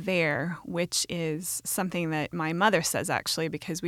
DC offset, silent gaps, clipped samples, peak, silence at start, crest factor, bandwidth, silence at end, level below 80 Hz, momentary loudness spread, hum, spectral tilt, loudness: under 0.1%; none; under 0.1%; -10 dBFS; 0 s; 18 dB; 17 kHz; 0 s; -62 dBFS; 7 LU; none; -3.5 dB/octave; -28 LUFS